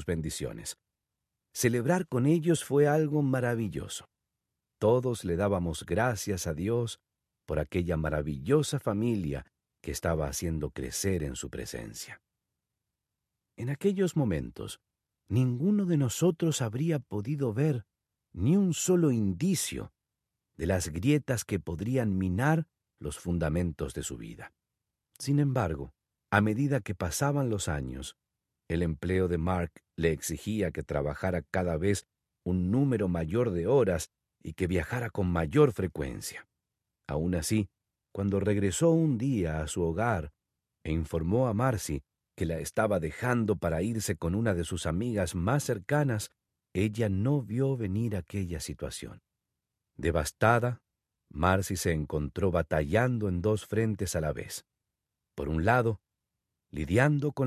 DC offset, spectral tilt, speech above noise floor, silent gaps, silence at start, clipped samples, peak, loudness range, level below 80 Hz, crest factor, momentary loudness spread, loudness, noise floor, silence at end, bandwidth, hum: under 0.1%; -6 dB/octave; 58 dB; none; 0 s; under 0.1%; -8 dBFS; 4 LU; -46 dBFS; 22 dB; 14 LU; -30 LUFS; -87 dBFS; 0 s; 14.5 kHz; none